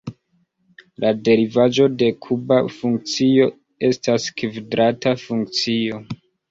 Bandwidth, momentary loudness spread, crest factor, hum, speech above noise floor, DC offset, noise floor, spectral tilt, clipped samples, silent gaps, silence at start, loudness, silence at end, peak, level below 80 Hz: 7.8 kHz; 10 LU; 16 dB; none; 47 dB; under 0.1%; -65 dBFS; -5.5 dB/octave; under 0.1%; none; 0.05 s; -19 LUFS; 0.35 s; -4 dBFS; -58 dBFS